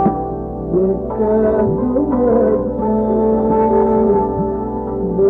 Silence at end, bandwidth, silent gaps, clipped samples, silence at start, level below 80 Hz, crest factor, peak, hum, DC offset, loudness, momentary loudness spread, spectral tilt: 0 s; 2.8 kHz; none; under 0.1%; 0 s; -32 dBFS; 12 dB; -4 dBFS; none; under 0.1%; -16 LUFS; 8 LU; -12 dB/octave